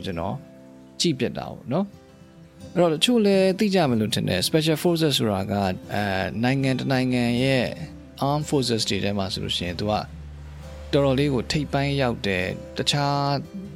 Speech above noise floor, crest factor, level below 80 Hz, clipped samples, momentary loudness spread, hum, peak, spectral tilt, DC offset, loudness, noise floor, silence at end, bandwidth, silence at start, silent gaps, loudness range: 25 dB; 18 dB; -46 dBFS; under 0.1%; 10 LU; none; -6 dBFS; -5 dB/octave; under 0.1%; -23 LUFS; -48 dBFS; 0 s; 16.5 kHz; 0 s; none; 4 LU